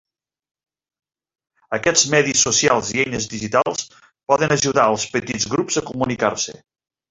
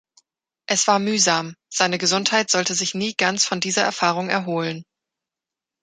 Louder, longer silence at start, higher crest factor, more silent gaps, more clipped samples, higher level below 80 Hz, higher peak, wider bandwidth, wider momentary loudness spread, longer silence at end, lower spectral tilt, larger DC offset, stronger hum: about the same, -18 LUFS vs -20 LUFS; first, 1.7 s vs 0.7 s; about the same, 20 dB vs 22 dB; neither; neither; first, -54 dBFS vs -70 dBFS; about the same, -2 dBFS vs 0 dBFS; second, 8.4 kHz vs 11 kHz; first, 11 LU vs 8 LU; second, 0.6 s vs 1 s; about the same, -2.5 dB/octave vs -2 dB/octave; neither; neither